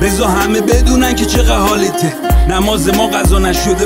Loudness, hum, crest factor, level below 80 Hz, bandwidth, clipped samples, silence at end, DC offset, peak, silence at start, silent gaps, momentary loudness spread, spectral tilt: -12 LUFS; none; 10 dB; -16 dBFS; 16.5 kHz; under 0.1%; 0 s; under 0.1%; 0 dBFS; 0 s; none; 2 LU; -4.5 dB/octave